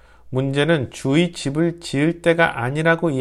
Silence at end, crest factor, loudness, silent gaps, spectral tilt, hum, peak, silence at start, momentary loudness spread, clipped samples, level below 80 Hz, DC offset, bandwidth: 0 s; 18 dB; -20 LUFS; none; -6 dB/octave; none; -2 dBFS; 0.25 s; 5 LU; under 0.1%; -50 dBFS; under 0.1%; 12.5 kHz